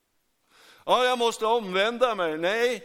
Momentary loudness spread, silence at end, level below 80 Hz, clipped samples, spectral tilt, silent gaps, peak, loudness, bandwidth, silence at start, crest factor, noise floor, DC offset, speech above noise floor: 3 LU; 0 s; -68 dBFS; under 0.1%; -3 dB/octave; none; -8 dBFS; -24 LUFS; 16.5 kHz; 0.85 s; 18 dB; -71 dBFS; under 0.1%; 47 dB